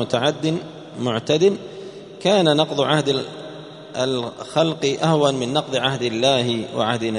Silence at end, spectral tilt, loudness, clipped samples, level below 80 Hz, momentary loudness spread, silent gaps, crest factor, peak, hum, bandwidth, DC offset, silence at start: 0 s; -5 dB/octave; -20 LUFS; under 0.1%; -60 dBFS; 16 LU; none; 20 dB; -2 dBFS; none; 11 kHz; under 0.1%; 0 s